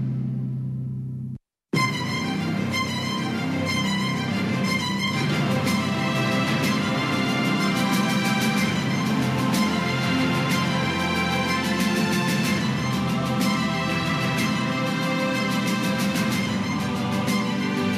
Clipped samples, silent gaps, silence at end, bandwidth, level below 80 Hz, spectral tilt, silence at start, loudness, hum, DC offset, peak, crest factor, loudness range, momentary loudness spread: under 0.1%; none; 0 s; 15.5 kHz; -54 dBFS; -5 dB/octave; 0 s; -23 LUFS; none; under 0.1%; -10 dBFS; 12 dB; 3 LU; 4 LU